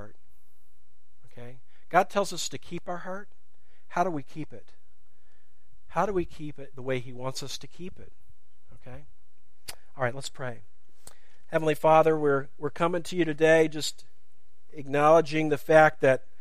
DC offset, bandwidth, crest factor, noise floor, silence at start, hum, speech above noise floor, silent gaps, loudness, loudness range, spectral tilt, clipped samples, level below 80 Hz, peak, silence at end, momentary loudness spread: 2%; 15.5 kHz; 24 dB; -70 dBFS; 0 s; none; 44 dB; none; -26 LUFS; 14 LU; -5 dB/octave; under 0.1%; -60 dBFS; -6 dBFS; 0.25 s; 22 LU